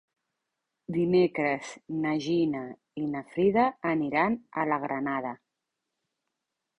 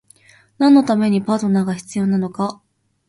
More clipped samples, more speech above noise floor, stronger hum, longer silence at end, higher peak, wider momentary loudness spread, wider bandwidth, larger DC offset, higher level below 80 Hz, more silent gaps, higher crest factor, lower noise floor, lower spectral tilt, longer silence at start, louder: neither; first, 57 dB vs 35 dB; neither; first, 1.45 s vs 0.55 s; second, -10 dBFS vs -2 dBFS; about the same, 12 LU vs 10 LU; second, 10 kHz vs 11.5 kHz; neither; second, -68 dBFS vs -60 dBFS; neither; about the same, 18 dB vs 16 dB; first, -85 dBFS vs -51 dBFS; about the same, -7 dB/octave vs -7 dB/octave; first, 0.9 s vs 0.6 s; second, -28 LUFS vs -17 LUFS